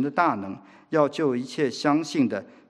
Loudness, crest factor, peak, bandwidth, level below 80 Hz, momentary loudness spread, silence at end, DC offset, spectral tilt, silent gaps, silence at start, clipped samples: -25 LUFS; 18 dB; -6 dBFS; 11 kHz; -76 dBFS; 8 LU; 0.25 s; under 0.1%; -5.5 dB/octave; none; 0 s; under 0.1%